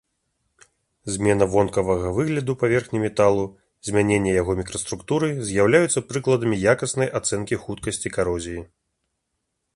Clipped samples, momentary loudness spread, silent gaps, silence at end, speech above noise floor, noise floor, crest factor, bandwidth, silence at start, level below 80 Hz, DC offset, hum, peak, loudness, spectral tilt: under 0.1%; 10 LU; none; 1.1 s; 56 dB; -77 dBFS; 20 dB; 11.5 kHz; 1.05 s; -46 dBFS; under 0.1%; none; -2 dBFS; -22 LUFS; -5 dB/octave